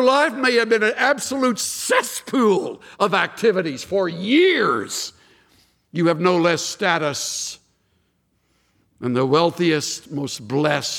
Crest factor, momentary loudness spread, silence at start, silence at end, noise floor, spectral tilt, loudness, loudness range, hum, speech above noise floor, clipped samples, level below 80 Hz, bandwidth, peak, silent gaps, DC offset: 18 dB; 10 LU; 0 s; 0 s; -66 dBFS; -4 dB/octave; -20 LUFS; 4 LU; none; 47 dB; under 0.1%; -66 dBFS; 18 kHz; -2 dBFS; none; under 0.1%